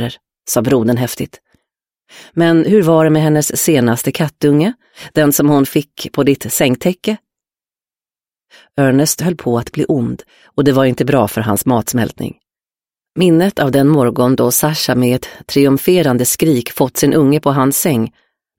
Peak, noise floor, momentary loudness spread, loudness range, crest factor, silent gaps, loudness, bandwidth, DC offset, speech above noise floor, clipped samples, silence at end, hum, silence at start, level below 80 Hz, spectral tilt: 0 dBFS; under -90 dBFS; 10 LU; 5 LU; 14 dB; none; -13 LUFS; 17 kHz; under 0.1%; over 77 dB; under 0.1%; 0.5 s; none; 0 s; -48 dBFS; -5 dB/octave